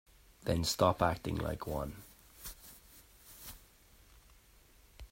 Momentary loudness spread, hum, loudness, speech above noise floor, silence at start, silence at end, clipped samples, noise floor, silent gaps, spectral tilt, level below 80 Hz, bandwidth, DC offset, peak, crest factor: 26 LU; none; -35 LUFS; 29 dB; 0.4 s; 0.05 s; under 0.1%; -63 dBFS; none; -5 dB/octave; -54 dBFS; 16.5 kHz; under 0.1%; -14 dBFS; 24 dB